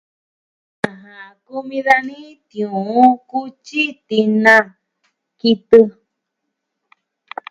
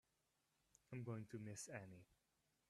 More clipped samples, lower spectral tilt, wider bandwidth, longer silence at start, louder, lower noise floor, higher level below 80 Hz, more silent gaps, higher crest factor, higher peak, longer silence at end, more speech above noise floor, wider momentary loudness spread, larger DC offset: first, 0.2% vs under 0.1%; about the same, -5.5 dB/octave vs -5.5 dB/octave; second, 11.5 kHz vs 13.5 kHz; about the same, 0.85 s vs 0.9 s; first, -15 LUFS vs -54 LUFS; second, -77 dBFS vs -87 dBFS; first, -60 dBFS vs -86 dBFS; neither; about the same, 18 dB vs 18 dB; first, 0 dBFS vs -38 dBFS; first, 1.6 s vs 0.55 s; first, 61 dB vs 33 dB; first, 19 LU vs 10 LU; neither